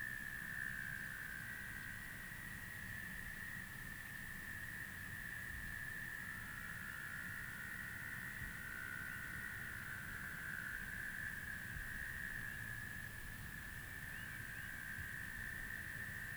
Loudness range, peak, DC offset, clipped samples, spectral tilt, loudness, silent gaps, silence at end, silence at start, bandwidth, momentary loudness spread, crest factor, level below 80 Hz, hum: 2 LU; -32 dBFS; under 0.1%; under 0.1%; -3 dB/octave; -47 LUFS; none; 0 s; 0 s; over 20 kHz; 3 LU; 16 dB; -60 dBFS; none